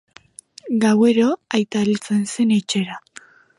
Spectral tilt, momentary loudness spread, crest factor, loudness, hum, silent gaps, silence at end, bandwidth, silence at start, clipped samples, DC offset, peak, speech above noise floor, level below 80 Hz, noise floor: -5 dB/octave; 11 LU; 16 dB; -19 LUFS; none; none; 0.6 s; 11.5 kHz; 0.65 s; under 0.1%; under 0.1%; -4 dBFS; 28 dB; -66 dBFS; -46 dBFS